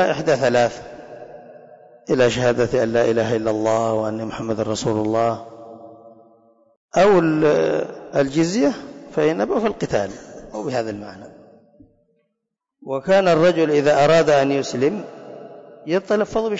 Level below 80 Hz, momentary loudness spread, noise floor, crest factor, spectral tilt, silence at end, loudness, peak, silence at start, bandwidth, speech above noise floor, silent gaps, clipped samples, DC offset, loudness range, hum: -52 dBFS; 23 LU; -79 dBFS; 12 dB; -5.5 dB/octave; 0 s; -19 LUFS; -8 dBFS; 0 s; 8 kHz; 60 dB; 6.77-6.88 s; under 0.1%; under 0.1%; 7 LU; none